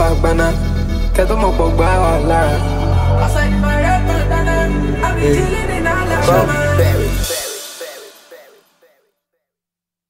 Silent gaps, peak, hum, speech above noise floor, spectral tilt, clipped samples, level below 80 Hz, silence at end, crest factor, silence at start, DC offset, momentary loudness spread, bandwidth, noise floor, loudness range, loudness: none; -2 dBFS; none; 73 dB; -6 dB/octave; under 0.1%; -20 dBFS; 1.75 s; 14 dB; 0 s; under 0.1%; 6 LU; 16.5 kHz; -86 dBFS; 4 LU; -15 LUFS